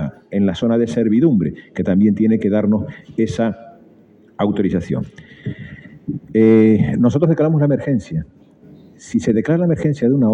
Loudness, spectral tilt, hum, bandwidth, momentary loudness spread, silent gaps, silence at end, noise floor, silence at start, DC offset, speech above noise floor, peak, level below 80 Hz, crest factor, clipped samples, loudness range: -17 LUFS; -8.5 dB/octave; none; 8.4 kHz; 15 LU; none; 0 s; -48 dBFS; 0 s; under 0.1%; 32 dB; -2 dBFS; -48 dBFS; 14 dB; under 0.1%; 6 LU